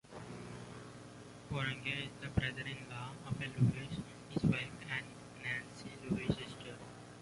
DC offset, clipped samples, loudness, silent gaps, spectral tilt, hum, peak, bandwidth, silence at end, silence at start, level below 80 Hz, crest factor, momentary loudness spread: under 0.1%; under 0.1%; -40 LUFS; none; -6 dB/octave; 60 Hz at -55 dBFS; -18 dBFS; 11.5 kHz; 0 s; 0.05 s; -58 dBFS; 22 dB; 17 LU